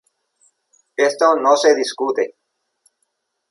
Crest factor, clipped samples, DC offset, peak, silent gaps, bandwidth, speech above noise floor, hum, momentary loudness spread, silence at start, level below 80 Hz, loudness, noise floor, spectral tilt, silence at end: 18 dB; under 0.1%; under 0.1%; -2 dBFS; none; 11.5 kHz; 56 dB; none; 11 LU; 1 s; -76 dBFS; -17 LUFS; -72 dBFS; -1.5 dB/octave; 1.25 s